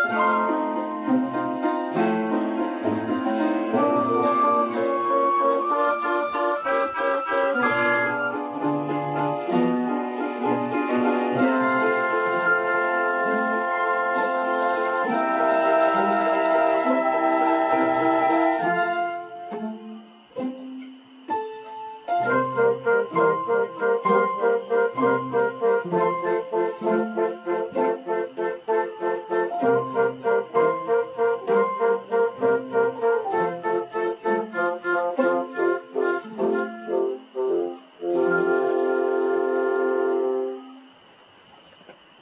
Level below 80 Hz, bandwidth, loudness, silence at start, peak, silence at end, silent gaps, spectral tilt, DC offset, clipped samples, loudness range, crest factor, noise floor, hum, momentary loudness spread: -72 dBFS; 4 kHz; -23 LUFS; 0 s; -8 dBFS; 0.3 s; none; -9.5 dB/octave; under 0.1%; under 0.1%; 4 LU; 14 dB; -52 dBFS; none; 7 LU